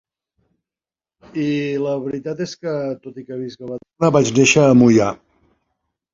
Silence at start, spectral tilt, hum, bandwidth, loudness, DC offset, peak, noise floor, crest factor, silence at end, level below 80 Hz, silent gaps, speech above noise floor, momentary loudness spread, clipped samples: 1.35 s; -5.5 dB/octave; none; 7.6 kHz; -17 LUFS; under 0.1%; -2 dBFS; under -90 dBFS; 18 dB; 1 s; -54 dBFS; none; over 73 dB; 20 LU; under 0.1%